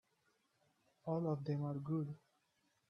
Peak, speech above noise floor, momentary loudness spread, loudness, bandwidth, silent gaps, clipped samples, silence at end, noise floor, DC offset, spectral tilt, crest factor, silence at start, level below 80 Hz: -26 dBFS; 41 dB; 11 LU; -42 LUFS; 6.2 kHz; none; under 0.1%; 0.75 s; -81 dBFS; under 0.1%; -10.5 dB/octave; 18 dB; 1.05 s; -80 dBFS